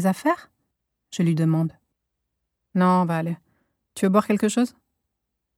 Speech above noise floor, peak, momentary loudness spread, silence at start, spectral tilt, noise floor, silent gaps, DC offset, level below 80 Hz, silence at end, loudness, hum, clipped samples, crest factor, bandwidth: 59 dB; -6 dBFS; 11 LU; 0 s; -7 dB/octave; -80 dBFS; none; under 0.1%; -70 dBFS; 0.9 s; -23 LUFS; none; under 0.1%; 20 dB; 15.5 kHz